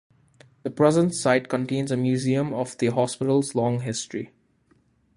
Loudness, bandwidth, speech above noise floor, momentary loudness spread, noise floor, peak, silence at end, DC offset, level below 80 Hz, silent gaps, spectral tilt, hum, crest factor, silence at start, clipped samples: -24 LUFS; 11.5 kHz; 40 dB; 13 LU; -63 dBFS; -4 dBFS; 0.9 s; under 0.1%; -62 dBFS; none; -6 dB/octave; none; 20 dB; 0.65 s; under 0.1%